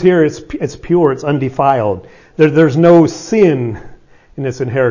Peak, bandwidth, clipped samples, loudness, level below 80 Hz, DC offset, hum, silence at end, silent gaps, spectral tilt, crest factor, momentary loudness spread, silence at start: 0 dBFS; 7.4 kHz; under 0.1%; -13 LUFS; -44 dBFS; under 0.1%; none; 0 s; none; -7.5 dB/octave; 12 dB; 14 LU; 0 s